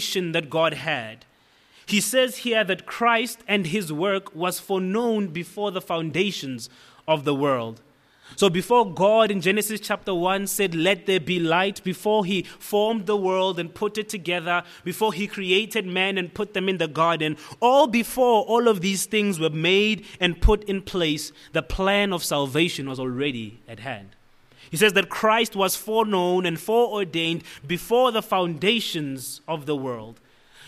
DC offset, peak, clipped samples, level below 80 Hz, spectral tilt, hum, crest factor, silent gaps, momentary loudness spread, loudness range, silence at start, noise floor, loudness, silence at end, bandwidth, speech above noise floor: under 0.1%; -4 dBFS; under 0.1%; -42 dBFS; -4 dB/octave; none; 20 dB; none; 10 LU; 4 LU; 0 s; -57 dBFS; -23 LUFS; 0 s; 15.5 kHz; 34 dB